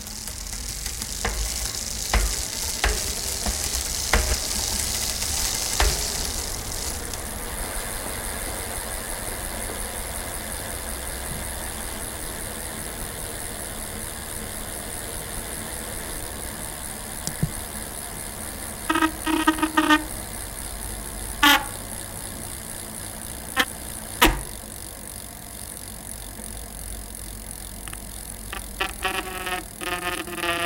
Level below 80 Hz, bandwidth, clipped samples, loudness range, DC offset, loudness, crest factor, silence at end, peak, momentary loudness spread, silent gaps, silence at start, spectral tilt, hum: -36 dBFS; 17 kHz; under 0.1%; 8 LU; under 0.1%; -27 LUFS; 28 dB; 0 s; 0 dBFS; 13 LU; none; 0 s; -2 dB/octave; none